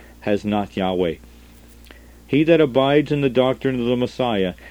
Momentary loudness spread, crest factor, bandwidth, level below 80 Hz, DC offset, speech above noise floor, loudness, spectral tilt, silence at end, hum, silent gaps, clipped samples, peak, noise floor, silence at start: 8 LU; 18 dB; over 20 kHz; -46 dBFS; 0.1%; 26 dB; -20 LUFS; -7.5 dB/octave; 0 s; none; none; under 0.1%; -2 dBFS; -45 dBFS; 0.2 s